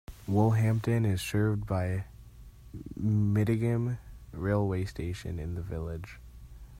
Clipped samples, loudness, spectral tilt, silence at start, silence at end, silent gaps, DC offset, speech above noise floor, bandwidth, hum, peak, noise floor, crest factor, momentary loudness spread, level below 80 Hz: under 0.1%; -30 LUFS; -7.5 dB/octave; 0.1 s; 0 s; none; under 0.1%; 21 dB; 15.5 kHz; none; -12 dBFS; -50 dBFS; 18 dB; 17 LU; -48 dBFS